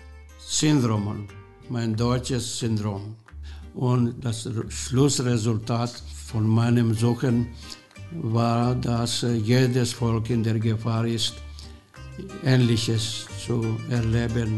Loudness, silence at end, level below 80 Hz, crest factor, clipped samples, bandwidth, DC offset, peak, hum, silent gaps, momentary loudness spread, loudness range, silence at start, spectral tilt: -24 LUFS; 0 s; -44 dBFS; 18 dB; under 0.1%; 12.5 kHz; 0.1%; -6 dBFS; none; none; 19 LU; 3 LU; 0 s; -5.5 dB/octave